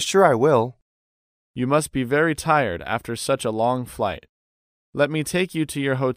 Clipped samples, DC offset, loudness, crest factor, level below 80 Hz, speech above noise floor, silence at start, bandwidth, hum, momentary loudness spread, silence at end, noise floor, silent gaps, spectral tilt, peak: under 0.1%; under 0.1%; -22 LUFS; 20 dB; -52 dBFS; over 69 dB; 0 s; 15.5 kHz; none; 10 LU; 0 s; under -90 dBFS; 0.82-1.54 s, 4.29-4.93 s; -5 dB/octave; -2 dBFS